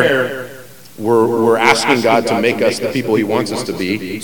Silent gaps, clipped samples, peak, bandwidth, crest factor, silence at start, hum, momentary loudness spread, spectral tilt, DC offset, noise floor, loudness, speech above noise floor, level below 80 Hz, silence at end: none; under 0.1%; 0 dBFS; 18 kHz; 16 dB; 0 s; none; 10 LU; -4.5 dB/octave; 0.9%; -37 dBFS; -15 LUFS; 22 dB; -56 dBFS; 0 s